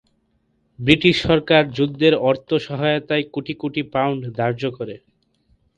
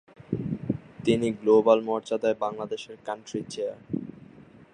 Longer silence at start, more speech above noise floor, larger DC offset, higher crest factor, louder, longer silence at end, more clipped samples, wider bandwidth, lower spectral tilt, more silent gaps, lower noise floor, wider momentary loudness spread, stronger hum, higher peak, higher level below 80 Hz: first, 0.8 s vs 0.3 s; first, 46 dB vs 25 dB; neither; about the same, 20 dB vs 22 dB; first, -19 LUFS vs -27 LUFS; first, 0.8 s vs 0.65 s; neither; about the same, 9.2 kHz vs 10 kHz; about the same, -6.5 dB/octave vs -6.5 dB/octave; neither; first, -66 dBFS vs -50 dBFS; second, 11 LU vs 14 LU; neither; first, 0 dBFS vs -6 dBFS; first, -48 dBFS vs -60 dBFS